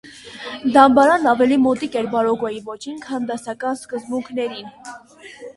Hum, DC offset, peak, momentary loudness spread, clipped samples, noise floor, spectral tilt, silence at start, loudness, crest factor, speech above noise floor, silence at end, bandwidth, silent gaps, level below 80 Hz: none; under 0.1%; 0 dBFS; 24 LU; under 0.1%; -41 dBFS; -5 dB/octave; 0.05 s; -18 LUFS; 18 dB; 23 dB; 0.05 s; 11.5 kHz; none; -58 dBFS